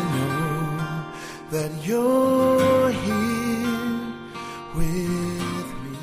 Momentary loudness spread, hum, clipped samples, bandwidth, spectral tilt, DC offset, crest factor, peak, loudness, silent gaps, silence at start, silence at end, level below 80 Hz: 15 LU; none; under 0.1%; 15.5 kHz; -6 dB/octave; under 0.1%; 14 dB; -8 dBFS; -24 LUFS; none; 0 s; 0 s; -40 dBFS